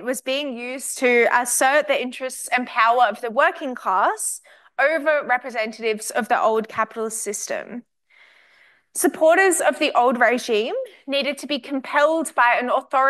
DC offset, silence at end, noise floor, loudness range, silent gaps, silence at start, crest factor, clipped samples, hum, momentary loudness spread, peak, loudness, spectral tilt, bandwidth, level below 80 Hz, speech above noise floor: under 0.1%; 0 s; -56 dBFS; 5 LU; none; 0 s; 16 dB; under 0.1%; none; 11 LU; -4 dBFS; -20 LUFS; -1.5 dB/octave; 13 kHz; -78 dBFS; 36 dB